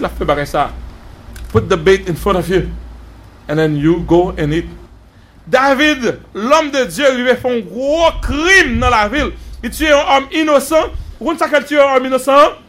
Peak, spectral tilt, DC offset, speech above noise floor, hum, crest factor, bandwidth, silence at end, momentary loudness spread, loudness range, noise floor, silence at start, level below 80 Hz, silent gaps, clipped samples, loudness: 0 dBFS; -5 dB/octave; under 0.1%; 29 dB; none; 14 dB; 16 kHz; 0.1 s; 11 LU; 4 LU; -42 dBFS; 0 s; -30 dBFS; none; under 0.1%; -13 LUFS